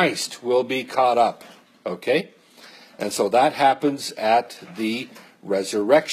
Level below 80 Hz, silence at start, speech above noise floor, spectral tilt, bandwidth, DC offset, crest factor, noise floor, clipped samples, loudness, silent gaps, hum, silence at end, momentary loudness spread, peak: -74 dBFS; 0 s; 26 dB; -4 dB/octave; 15 kHz; under 0.1%; 20 dB; -47 dBFS; under 0.1%; -22 LUFS; none; none; 0 s; 16 LU; -2 dBFS